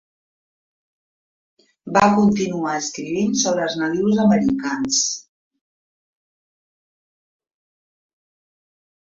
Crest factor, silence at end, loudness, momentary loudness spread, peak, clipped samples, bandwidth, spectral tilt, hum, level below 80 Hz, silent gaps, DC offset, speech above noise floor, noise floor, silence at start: 22 dB; 4 s; -19 LUFS; 8 LU; -2 dBFS; under 0.1%; 7.8 kHz; -4 dB/octave; none; -58 dBFS; none; under 0.1%; over 71 dB; under -90 dBFS; 1.85 s